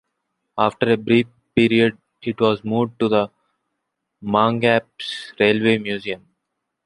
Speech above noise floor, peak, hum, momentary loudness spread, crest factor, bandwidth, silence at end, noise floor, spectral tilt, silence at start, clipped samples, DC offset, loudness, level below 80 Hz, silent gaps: 59 dB; -2 dBFS; none; 13 LU; 20 dB; 11 kHz; 0.7 s; -78 dBFS; -6.5 dB/octave; 0.55 s; under 0.1%; under 0.1%; -20 LUFS; -58 dBFS; none